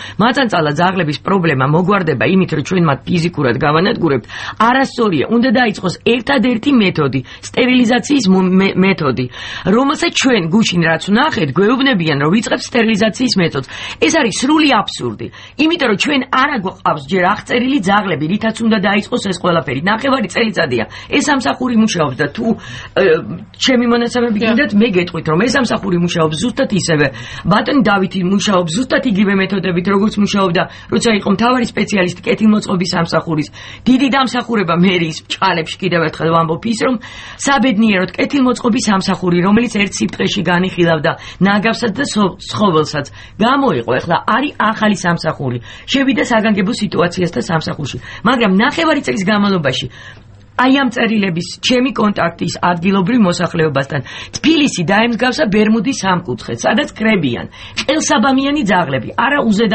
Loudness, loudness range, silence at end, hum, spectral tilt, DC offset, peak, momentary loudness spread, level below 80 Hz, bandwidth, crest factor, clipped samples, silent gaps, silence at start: -14 LUFS; 2 LU; 0 s; none; -5 dB/octave; under 0.1%; 0 dBFS; 6 LU; -44 dBFS; 8.8 kHz; 14 dB; under 0.1%; none; 0 s